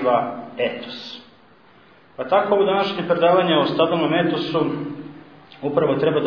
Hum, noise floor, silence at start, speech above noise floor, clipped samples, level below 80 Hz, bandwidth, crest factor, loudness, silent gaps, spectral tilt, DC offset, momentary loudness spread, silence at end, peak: none; -51 dBFS; 0 s; 32 dB; under 0.1%; -64 dBFS; 5.4 kHz; 18 dB; -20 LUFS; none; -7.5 dB/octave; 0.1%; 16 LU; 0 s; -4 dBFS